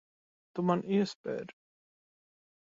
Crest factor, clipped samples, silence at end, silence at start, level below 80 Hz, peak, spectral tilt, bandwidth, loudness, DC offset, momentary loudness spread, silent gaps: 22 dB; under 0.1%; 1.15 s; 0.55 s; -78 dBFS; -14 dBFS; -7 dB/octave; 7.6 kHz; -33 LUFS; under 0.1%; 14 LU; 1.15-1.24 s